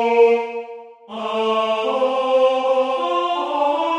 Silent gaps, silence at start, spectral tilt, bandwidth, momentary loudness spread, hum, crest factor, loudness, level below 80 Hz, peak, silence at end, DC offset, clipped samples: none; 0 s; -4 dB/octave; 9.8 kHz; 14 LU; none; 14 dB; -19 LUFS; -74 dBFS; -4 dBFS; 0 s; under 0.1%; under 0.1%